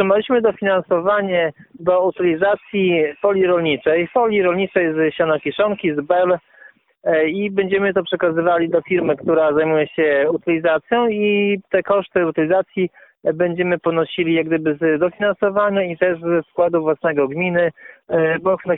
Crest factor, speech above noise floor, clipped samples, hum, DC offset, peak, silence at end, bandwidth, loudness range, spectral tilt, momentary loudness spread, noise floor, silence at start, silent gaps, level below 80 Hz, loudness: 16 dB; 31 dB; under 0.1%; none; under 0.1%; -2 dBFS; 0 s; 4 kHz; 2 LU; -11 dB/octave; 3 LU; -48 dBFS; 0 s; none; -58 dBFS; -18 LUFS